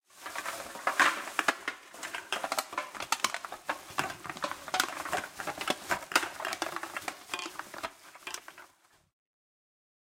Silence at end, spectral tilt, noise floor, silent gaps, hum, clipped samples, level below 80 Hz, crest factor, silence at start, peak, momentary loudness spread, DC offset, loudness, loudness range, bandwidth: 1.35 s; -1 dB/octave; -63 dBFS; none; none; under 0.1%; -72 dBFS; 28 dB; 0.15 s; -6 dBFS; 12 LU; under 0.1%; -34 LUFS; 8 LU; 16.5 kHz